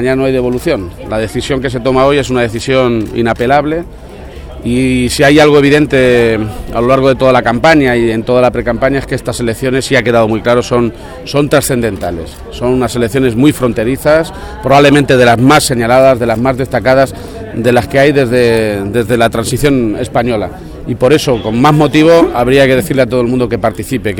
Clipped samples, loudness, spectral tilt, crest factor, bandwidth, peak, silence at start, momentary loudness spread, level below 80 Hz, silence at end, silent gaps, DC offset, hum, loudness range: 0.4%; -10 LUFS; -5.5 dB/octave; 10 dB; 18 kHz; 0 dBFS; 0 s; 10 LU; -30 dBFS; 0 s; none; under 0.1%; none; 4 LU